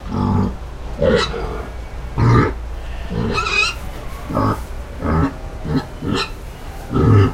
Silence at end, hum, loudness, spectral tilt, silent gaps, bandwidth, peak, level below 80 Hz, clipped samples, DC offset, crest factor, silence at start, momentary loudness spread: 0 s; none; -19 LUFS; -6.5 dB/octave; none; 15 kHz; 0 dBFS; -28 dBFS; under 0.1%; under 0.1%; 18 dB; 0 s; 17 LU